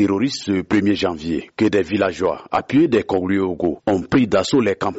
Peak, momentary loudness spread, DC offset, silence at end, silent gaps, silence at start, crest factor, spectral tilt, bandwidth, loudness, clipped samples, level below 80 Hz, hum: -6 dBFS; 5 LU; under 0.1%; 0 s; none; 0 s; 12 dB; -5 dB/octave; 8 kHz; -19 LUFS; under 0.1%; -48 dBFS; none